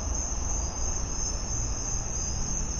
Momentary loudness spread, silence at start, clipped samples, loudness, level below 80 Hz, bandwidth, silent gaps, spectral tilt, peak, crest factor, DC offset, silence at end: 1 LU; 0 s; under 0.1%; -30 LUFS; -34 dBFS; 11 kHz; none; -3 dB/octave; -18 dBFS; 12 dB; under 0.1%; 0 s